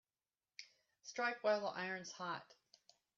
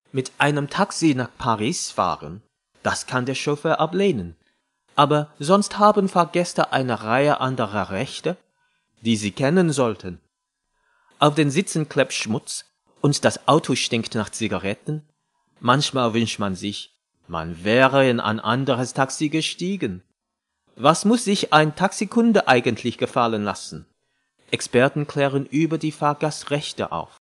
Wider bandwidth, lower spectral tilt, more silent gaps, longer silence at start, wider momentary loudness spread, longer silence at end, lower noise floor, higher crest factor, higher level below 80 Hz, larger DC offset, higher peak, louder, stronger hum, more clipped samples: second, 7.4 kHz vs 12.5 kHz; second, -1.5 dB/octave vs -5 dB/octave; neither; first, 0.6 s vs 0.15 s; first, 19 LU vs 12 LU; first, 0.65 s vs 0.15 s; first, under -90 dBFS vs -80 dBFS; about the same, 20 dB vs 22 dB; second, under -90 dBFS vs -60 dBFS; neither; second, -26 dBFS vs 0 dBFS; second, -42 LUFS vs -21 LUFS; neither; neither